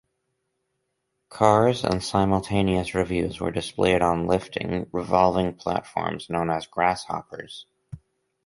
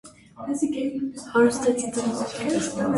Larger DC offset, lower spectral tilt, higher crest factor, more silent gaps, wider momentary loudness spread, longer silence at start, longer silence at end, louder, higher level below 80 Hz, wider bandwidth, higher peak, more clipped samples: neither; first, -6 dB/octave vs -4.5 dB/octave; about the same, 22 dB vs 18 dB; neither; about the same, 11 LU vs 10 LU; first, 1.3 s vs 0.05 s; first, 0.5 s vs 0 s; about the same, -24 LUFS vs -25 LUFS; first, -46 dBFS vs -58 dBFS; about the same, 11.5 kHz vs 11.5 kHz; first, -2 dBFS vs -8 dBFS; neither